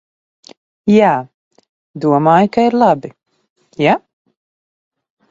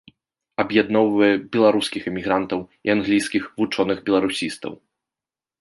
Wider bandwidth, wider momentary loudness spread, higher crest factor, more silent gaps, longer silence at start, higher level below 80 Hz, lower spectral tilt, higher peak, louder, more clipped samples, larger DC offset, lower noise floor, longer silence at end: second, 7.6 kHz vs 11.5 kHz; about the same, 10 LU vs 10 LU; about the same, 16 dB vs 18 dB; first, 1.34-1.51 s, 1.69-1.94 s, 3.50-3.56 s vs none; first, 0.85 s vs 0.6 s; about the same, -58 dBFS vs -58 dBFS; first, -7.5 dB/octave vs -5 dB/octave; first, 0 dBFS vs -4 dBFS; first, -14 LUFS vs -21 LUFS; neither; neither; about the same, under -90 dBFS vs under -90 dBFS; first, 1.3 s vs 0.85 s